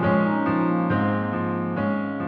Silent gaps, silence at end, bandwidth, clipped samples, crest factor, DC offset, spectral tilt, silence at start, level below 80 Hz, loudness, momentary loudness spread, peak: none; 0 s; 4.9 kHz; under 0.1%; 14 dB; under 0.1%; -10.5 dB/octave; 0 s; -56 dBFS; -23 LUFS; 5 LU; -8 dBFS